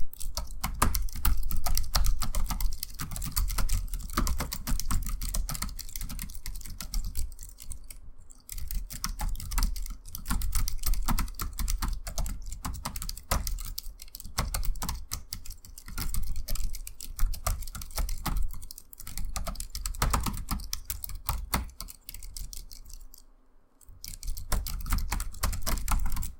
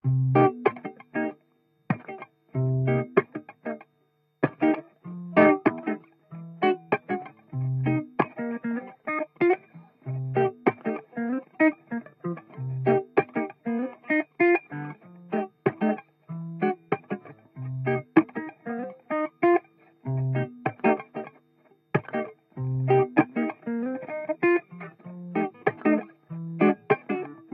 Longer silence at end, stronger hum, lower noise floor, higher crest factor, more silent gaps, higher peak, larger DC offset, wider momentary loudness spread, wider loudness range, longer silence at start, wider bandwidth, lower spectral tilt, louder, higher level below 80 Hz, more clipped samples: second, 0 s vs 0.15 s; neither; second, -57 dBFS vs -69 dBFS; about the same, 26 dB vs 24 dB; neither; about the same, -4 dBFS vs -4 dBFS; neither; second, 12 LU vs 16 LU; first, 6 LU vs 3 LU; about the same, 0 s vs 0.05 s; first, 17 kHz vs 4.7 kHz; second, -3 dB/octave vs -11.5 dB/octave; second, -35 LUFS vs -27 LUFS; first, -32 dBFS vs -68 dBFS; neither